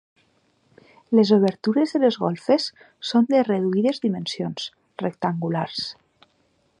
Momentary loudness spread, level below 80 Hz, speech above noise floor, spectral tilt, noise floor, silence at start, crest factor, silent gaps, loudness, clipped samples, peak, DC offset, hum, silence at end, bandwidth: 12 LU; -70 dBFS; 44 dB; -6.5 dB/octave; -65 dBFS; 1.1 s; 18 dB; none; -22 LUFS; under 0.1%; -4 dBFS; under 0.1%; none; 0.9 s; 10.5 kHz